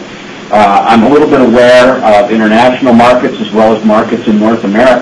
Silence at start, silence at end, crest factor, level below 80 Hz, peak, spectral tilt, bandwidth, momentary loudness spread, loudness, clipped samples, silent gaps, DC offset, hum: 0 s; 0 s; 6 dB; -38 dBFS; 0 dBFS; -6 dB/octave; 11 kHz; 6 LU; -6 LUFS; 0.9%; none; under 0.1%; none